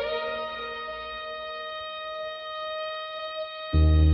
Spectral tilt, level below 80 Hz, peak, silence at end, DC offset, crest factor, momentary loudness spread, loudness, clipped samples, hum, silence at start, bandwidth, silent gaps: -8.5 dB/octave; -34 dBFS; -10 dBFS; 0 s; under 0.1%; 16 dB; 11 LU; -30 LUFS; under 0.1%; none; 0 s; 5.4 kHz; none